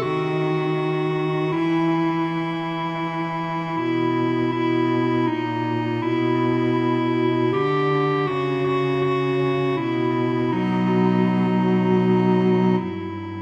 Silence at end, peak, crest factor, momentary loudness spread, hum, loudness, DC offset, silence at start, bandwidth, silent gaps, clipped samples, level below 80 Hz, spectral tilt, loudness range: 0 s; -8 dBFS; 12 dB; 7 LU; none; -21 LUFS; under 0.1%; 0 s; 7.8 kHz; none; under 0.1%; -60 dBFS; -8.5 dB/octave; 3 LU